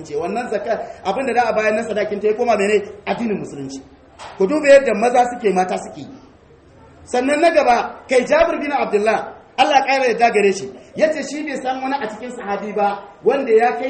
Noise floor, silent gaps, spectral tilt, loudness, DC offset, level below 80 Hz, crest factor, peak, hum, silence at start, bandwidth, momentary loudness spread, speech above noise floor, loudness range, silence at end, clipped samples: -47 dBFS; none; -4.5 dB/octave; -18 LUFS; under 0.1%; -52 dBFS; 18 dB; 0 dBFS; none; 0 s; 8.8 kHz; 13 LU; 30 dB; 4 LU; 0 s; under 0.1%